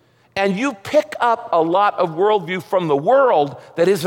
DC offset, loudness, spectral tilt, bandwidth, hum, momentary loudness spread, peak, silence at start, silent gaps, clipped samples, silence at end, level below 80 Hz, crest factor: under 0.1%; -18 LUFS; -5.5 dB/octave; 17 kHz; none; 7 LU; -4 dBFS; 0.35 s; none; under 0.1%; 0 s; -64 dBFS; 12 dB